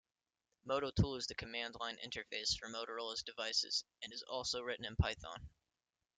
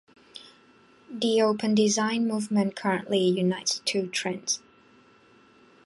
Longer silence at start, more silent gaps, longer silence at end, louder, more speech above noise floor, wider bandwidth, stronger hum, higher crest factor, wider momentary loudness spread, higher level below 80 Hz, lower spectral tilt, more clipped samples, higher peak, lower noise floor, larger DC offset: first, 0.65 s vs 0.35 s; neither; second, 0.7 s vs 1.3 s; second, -40 LUFS vs -26 LUFS; first, over 49 dB vs 32 dB; second, 9.6 kHz vs 11.5 kHz; neither; first, 22 dB vs 16 dB; second, 11 LU vs 18 LU; first, -54 dBFS vs -72 dBFS; about the same, -3.5 dB/octave vs -4 dB/octave; neither; second, -20 dBFS vs -10 dBFS; first, under -90 dBFS vs -57 dBFS; neither